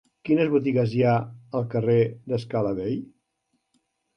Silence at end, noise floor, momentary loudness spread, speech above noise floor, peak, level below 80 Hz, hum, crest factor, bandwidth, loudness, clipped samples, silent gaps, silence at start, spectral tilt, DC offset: 1.1 s; -75 dBFS; 9 LU; 52 dB; -10 dBFS; -60 dBFS; none; 16 dB; 6.4 kHz; -24 LUFS; under 0.1%; none; 0.25 s; -9.5 dB/octave; under 0.1%